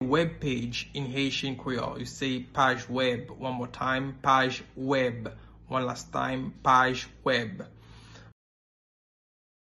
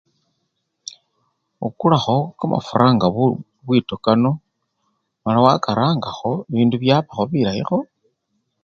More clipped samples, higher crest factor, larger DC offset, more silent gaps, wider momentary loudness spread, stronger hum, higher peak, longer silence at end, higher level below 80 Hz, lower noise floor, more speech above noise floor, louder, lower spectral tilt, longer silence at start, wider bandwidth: neither; about the same, 20 dB vs 20 dB; neither; neither; second, 11 LU vs 14 LU; neither; second, -10 dBFS vs 0 dBFS; first, 1.35 s vs 0.8 s; about the same, -54 dBFS vs -54 dBFS; second, -50 dBFS vs -73 dBFS; second, 21 dB vs 55 dB; second, -28 LUFS vs -19 LUFS; second, -5 dB/octave vs -7.5 dB/octave; second, 0 s vs 1.6 s; first, 12 kHz vs 7.2 kHz